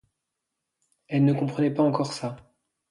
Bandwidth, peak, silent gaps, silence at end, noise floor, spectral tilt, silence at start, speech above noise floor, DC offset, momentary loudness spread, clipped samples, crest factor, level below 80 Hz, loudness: 11.5 kHz; -10 dBFS; none; 0.5 s; -83 dBFS; -7.5 dB/octave; 1.1 s; 59 dB; under 0.1%; 12 LU; under 0.1%; 18 dB; -68 dBFS; -25 LUFS